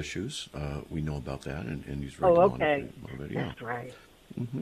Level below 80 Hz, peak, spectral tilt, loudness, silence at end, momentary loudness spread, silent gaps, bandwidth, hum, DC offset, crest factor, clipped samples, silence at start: -48 dBFS; -10 dBFS; -6 dB/octave; -30 LUFS; 0 s; 16 LU; none; 14 kHz; none; under 0.1%; 20 dB; under 0.1%; 0 s